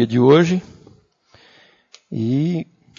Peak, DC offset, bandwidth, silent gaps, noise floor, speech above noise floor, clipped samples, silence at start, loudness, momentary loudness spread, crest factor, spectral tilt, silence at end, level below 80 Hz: -2 dBFS; under 0.1%; 7.4 kHz; none; -54 dBFS; 38 dB; under 0.1%; 0 s; -17 LUFS; 14 LU; 18 dB; -7.5 dB/octave; 0.35 s; -60 dBFS